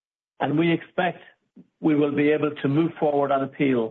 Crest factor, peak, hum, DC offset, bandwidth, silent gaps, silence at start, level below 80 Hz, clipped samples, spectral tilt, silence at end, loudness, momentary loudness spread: 14 dB; -10 dBFS; none; under 0.1%; 4.1 kHz; none; 0.4 s; -68 dBFS; under 0.1%; -9.5 dB/octave; 0 s; -23 LUFS; 6 LU